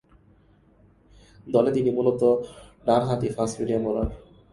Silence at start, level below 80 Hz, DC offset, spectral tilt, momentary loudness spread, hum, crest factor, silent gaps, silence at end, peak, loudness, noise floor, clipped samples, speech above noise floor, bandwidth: 1.45 s; -46 dBFS; under 0.1%; -7 dB/octave; 8 LU; 50 Hz at -55 dBFS; 20 dB; none; 0.3 s; -6 dBFS; -24 LUFS; -58 dBFS; under 0.1%; 35 dB; 11.5 kHz